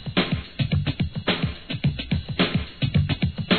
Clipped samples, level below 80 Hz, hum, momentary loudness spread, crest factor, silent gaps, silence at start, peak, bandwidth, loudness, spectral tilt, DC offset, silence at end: under 0.1%; -38 dBFS; none; 4 LU; 18 dB; none; 0 s; -6 dBFS; 4.6 kHz; -25 LUFS; -9 dB/octave; 0.3%; 0 s